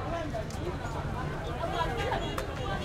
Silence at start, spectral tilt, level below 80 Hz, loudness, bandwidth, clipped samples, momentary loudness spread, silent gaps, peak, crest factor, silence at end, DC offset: 0 s; -5.5 dB/octave; -40 dBFS; -34 LUFS; 16.5 kHz; under 0.1%; 4 LU; none; -16 dBFS; 16 dB; 0 s; under 0.1%